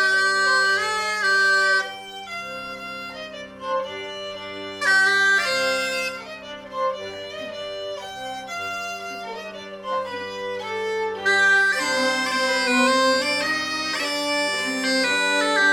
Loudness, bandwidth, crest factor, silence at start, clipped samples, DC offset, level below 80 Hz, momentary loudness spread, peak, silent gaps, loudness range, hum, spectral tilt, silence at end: -21 LUFS; 17 kHz; 16 dB; 0 s; under 0.1%; under 0.1%; -62 dBFS; 16 LU; -8 dBFS; none; 10 LU; none; -1.5 dB/octave; 0 s